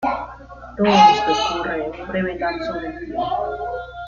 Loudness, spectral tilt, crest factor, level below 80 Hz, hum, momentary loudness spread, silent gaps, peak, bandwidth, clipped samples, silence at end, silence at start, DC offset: -20 LUFS; -4.5 dB/octave; 18 dB; -44 dBFS; none; 16 LU; none; -2 dBFS; 7.2 kHz; under 0.1%; 0 s; 0 s; under 0.1%